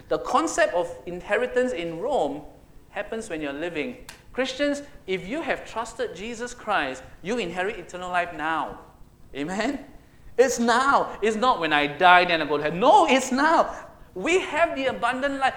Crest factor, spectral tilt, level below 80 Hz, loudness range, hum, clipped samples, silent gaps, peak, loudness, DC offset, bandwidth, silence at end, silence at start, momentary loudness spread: 24 dB; -3.5 dB/octave; -52 dBFS; 10 LU; none; under 0.1%; none; 0 dBFS; -24 LUFS; under 0.1%; 17 kHz; 0 s; 0.1 s; 15 LU